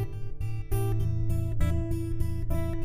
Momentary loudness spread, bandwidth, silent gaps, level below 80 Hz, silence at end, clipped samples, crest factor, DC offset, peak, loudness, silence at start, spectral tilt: 7 LU; 15.5 kHz; none; -32 dBFS; 0 s; under 0.1%; 14 dB; under 0.1%; -14 dBFS; -31 LUFS; 0 s; -8 dB/octave